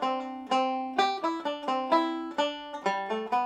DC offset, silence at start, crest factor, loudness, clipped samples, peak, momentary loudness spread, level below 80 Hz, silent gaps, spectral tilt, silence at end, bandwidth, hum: under 0.1%; 0 s; 18 dB; -29 LUFS; under 0.1%; -10 dBFS; 5 LU; -74 dBFS; none; -3.5 dB/octave; 0 s; 11.5 kHz; none